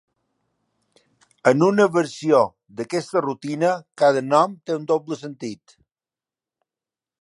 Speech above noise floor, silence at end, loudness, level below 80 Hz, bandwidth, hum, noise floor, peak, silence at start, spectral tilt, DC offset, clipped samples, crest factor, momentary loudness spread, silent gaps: over 70 dB; 1.65 s; -20 LUFS; -72 dBFS; 11.5 kHz; none; under -90 dBFS; -2 dBFS; 1.45 s; -6 dB/octave; under 0.1%; under 0.1%; 22 dB; 15 LU; none